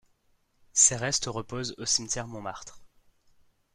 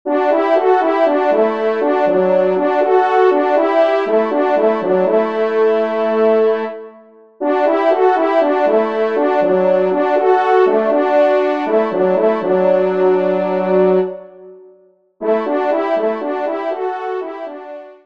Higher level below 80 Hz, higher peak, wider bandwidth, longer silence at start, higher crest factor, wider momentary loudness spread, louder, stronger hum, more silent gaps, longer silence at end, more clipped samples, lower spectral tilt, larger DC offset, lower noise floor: first, -58 dBFS vs -68 dBFS; second, -6 dBFS vs -2 dBFS; first, 14.5 kHz vs 6.2 kHz; first, 0.75 s vs 0.05 s; first, 24 dB vs 14 dB; first, 18 LU vs 8 LU; second, -26 LUFS vs -15 LUFS; neither; neither; first, 0.9 s vs 0.1 s; neither; second, -1.5 dB/octave vs -7.5 dB/octave; second, under 0.1% vs 0.4%; first, -69 dBFS vs -50 dBFS